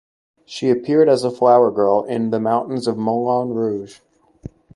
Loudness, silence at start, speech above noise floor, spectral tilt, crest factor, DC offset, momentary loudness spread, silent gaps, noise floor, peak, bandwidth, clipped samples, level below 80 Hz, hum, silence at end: -18 LUFS; 0.5 s; 22 dB; -7 dB/octave; 16 dB; under 0.1%; 10 LU; none; -39 dBFS; -2 dBFS; 11.5 kHz; under 0.1%; -58 dBFS; none; 0.3 s